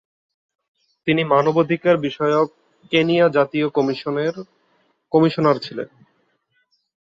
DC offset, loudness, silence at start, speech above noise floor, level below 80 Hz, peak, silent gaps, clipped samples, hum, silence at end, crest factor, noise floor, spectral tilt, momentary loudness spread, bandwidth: under 0.1%; -19 LUFS; 1.05 s; 49 dB; -64 dBFS; -2 dBFS; none; under 0.1%; none; 1.35 s; 18 dB; -67 dBFS; -7.5 dB/octave; 10 LU; 7.6 kHz